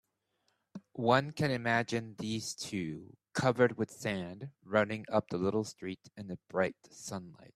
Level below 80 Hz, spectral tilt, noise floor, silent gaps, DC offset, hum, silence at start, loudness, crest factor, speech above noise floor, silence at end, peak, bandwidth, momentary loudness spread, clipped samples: -70 dBFS; -5.5 dB/octave; -79 dBFS; none; under 0.1%; none; 0.75 s; -34 LUFS; 22 dB; 45 dB; 0.1 s; -12 dBFS; 14 kHz; 17 LU; under 0.1%